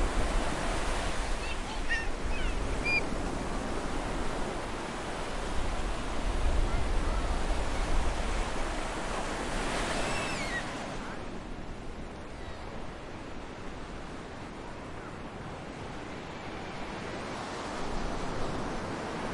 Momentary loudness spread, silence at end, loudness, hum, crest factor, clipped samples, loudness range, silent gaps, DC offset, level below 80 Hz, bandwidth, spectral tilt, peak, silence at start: 10 LU; 0 s; -35 LUFS; none; 18 dB; under 0.1%; 9 LU; none; under 0.1%; -36 dBFS; 11.5 kHz; -4.5 dB/octave; -14 dBFS; 0 s